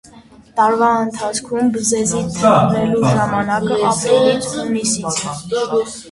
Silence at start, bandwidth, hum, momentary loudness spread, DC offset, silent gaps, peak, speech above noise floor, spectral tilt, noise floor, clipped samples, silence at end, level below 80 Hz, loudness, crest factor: 0.15 s; 11.5 kHz; none; 7 LU; under 0.1%; none; 0 dBFS; 27 dB; -4.5 dB/octave; -43 dBFS; under 0.1%; 0 s; -48 dBFS; -16 LUFS; 16 dB